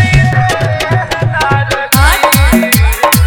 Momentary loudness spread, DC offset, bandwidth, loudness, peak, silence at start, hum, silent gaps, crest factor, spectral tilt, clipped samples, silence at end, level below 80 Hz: 5 LU; under 0.1%; over 20 kHz; -10 LUFS; 0 dBFS; 0 s; none; none; 10 dB; -4.5 dB/octave; 0.2%; 0 s; -16 dBFS